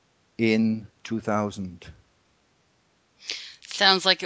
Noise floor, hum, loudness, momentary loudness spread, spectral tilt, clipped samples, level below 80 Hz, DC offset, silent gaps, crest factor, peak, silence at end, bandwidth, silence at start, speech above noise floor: -66 dBFS; none; -24 LUFS; 20 LU; -4 dB/octave; under 0.1%; -60 dBFS; under 0.1%; none; 24 dB; -4 dBFS; 0 s; 8 kHz; 0.4 s; 42 dB